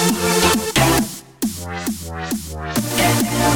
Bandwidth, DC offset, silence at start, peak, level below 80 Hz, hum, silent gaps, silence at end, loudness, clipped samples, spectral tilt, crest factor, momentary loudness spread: over 20 kHz; under 0.1%; 0 s; -2 dBFS; -38 dBFS; none; none; 0 s; -19 LUFS; under 0.1%; -3.5 dB/octave; 16 dB; 10 LU